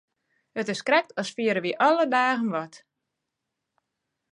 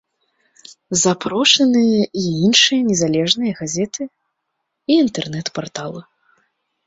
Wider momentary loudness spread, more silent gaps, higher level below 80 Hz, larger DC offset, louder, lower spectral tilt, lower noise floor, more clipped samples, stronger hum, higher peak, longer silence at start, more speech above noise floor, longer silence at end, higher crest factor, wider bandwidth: second, 11 LU vs 17 LU; neither; second, -82 dBFS vs -58 dBFS; neither; second, -24 LUFS vs -16 LUFS; about the same, -4.5 dB/octave vs -3.5 dB/octave; first, -83 dBFS vs -75 dBFS; neither; neither; second, -8 dBFS vs 0 dBFS; second, 0.55 s vs 0.7 s; about the same, 59 dB vs 58 dB; first, 1.55 s vs 0.85 s; about the same, 18 dB vs 18 dB; first, 11 kHz vs 8 kHz